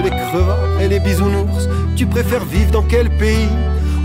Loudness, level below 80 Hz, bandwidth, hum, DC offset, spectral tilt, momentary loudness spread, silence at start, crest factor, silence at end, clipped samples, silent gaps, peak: -16 LUFS; -18 dBFS; 16 kHz; none; under 0.1%; -6.5 dB/octave; 3 LU; 0 s; 12 dB; 0 s; under 0.1%; none; -2 dBFS